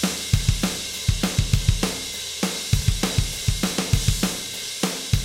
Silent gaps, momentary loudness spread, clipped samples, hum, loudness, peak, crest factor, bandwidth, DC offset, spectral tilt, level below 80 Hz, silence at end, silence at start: none; 4 LU; under 0.1%; none; -23 LUFS; -4 dBFS; 18 dB; 17 kHz; under 0.1%; -4 dB/octave; -30 dBFS; 0 s; 0 s